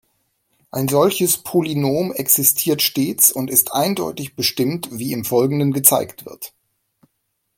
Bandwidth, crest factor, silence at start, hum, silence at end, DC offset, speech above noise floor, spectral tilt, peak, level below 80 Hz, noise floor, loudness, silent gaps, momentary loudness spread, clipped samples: 17 kHz; 20 dB; 0.75 s; none; 1.1 s; under 0.1%; 54 dB; -3.5 dB/octave; 0 dBFS; -60 dBFS; -72 dBFS; -17 LUFS; none; 13 LU; under 0.1%